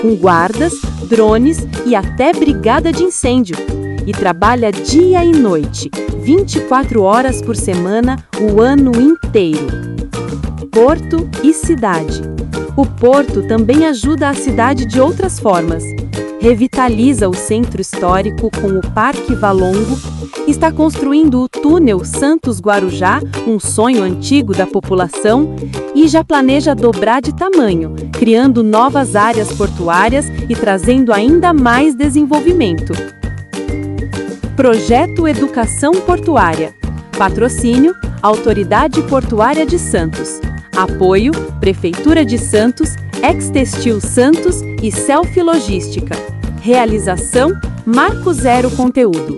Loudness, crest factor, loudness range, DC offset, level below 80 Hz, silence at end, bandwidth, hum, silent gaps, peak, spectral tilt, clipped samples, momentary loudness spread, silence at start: -12 LUFS; 12 dB; 3 LU; under 0.1%; -28 dBFS; 0 s; 12 kHz; none; none; 0 dBFS; -5.5 dB/octave; 0.3%; 10 LU; 0 s